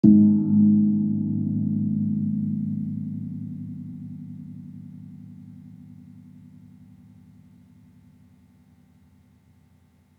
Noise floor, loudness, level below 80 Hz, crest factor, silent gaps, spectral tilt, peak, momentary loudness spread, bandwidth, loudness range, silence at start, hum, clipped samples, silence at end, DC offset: -59 dBFS; -23 LUFS; -70 dBFS; 22 dB; none; -13 dB/octave; -4 dBFS; 26 LU; 1 kHz; 25 LU; 0.05 s; none; under 0.1%; 4 s; under 0.1%